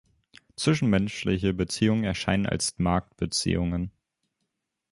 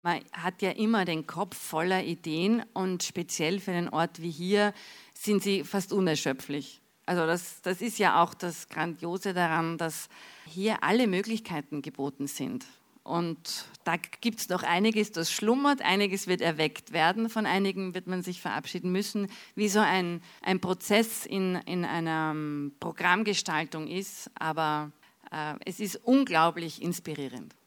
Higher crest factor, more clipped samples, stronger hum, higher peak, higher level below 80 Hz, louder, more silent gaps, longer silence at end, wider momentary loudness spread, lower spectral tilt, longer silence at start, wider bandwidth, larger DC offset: about the same, 20 dB vs 22 dB; neither; neither; about the same, -6 dBFS vs -8 dBFS; first, -44 dBFS vs -78 dBFS; first, -26 LUFS vs -29 LUFS; neither; first, 1 s vs 0.2 s; second, 5 LU vs 11 LU; about the same, -5 dB/octave vs -4.5 dB/octave; first, 0.6 s vs 0.05 s; second, 11.5 kHz vs over 20 kHz; neither